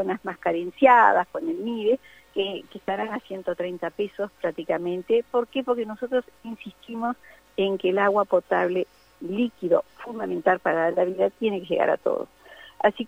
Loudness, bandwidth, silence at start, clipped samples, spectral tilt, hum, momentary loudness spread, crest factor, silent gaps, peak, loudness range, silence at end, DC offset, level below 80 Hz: -25 LUFS; 16 kHz; 0 s; under 0.1%; -6.5 dB/octave; none; 13 LU; 20 dB; none; -4 dBFS; 5 LU; 0 s; under 0.1%; -66 dBFS